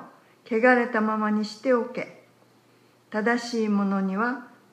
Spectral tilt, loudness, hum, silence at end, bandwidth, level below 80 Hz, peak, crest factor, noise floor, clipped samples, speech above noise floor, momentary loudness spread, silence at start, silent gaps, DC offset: -6 dB/octave; -25 LUFS; none; 0.25 s; 9.8 kHz; -82 dBFS; -6 dBFS; 18 dB; -59 dBFS; under 0.1%; 35 dB; 13 LU; 0 s; none; under 0.1%